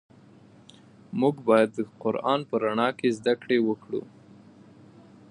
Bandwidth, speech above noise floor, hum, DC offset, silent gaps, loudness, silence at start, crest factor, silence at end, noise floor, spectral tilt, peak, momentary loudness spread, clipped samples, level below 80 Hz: 11 kHz; 28 dB; none; under 0.1%; none; -26 LUFS; 1.1 s; 22 dB; 1.25 s; -53 dBFS; -6.5 dB/octave; -6 dBFS; 10 LU; under 0.1%; -74 dBFS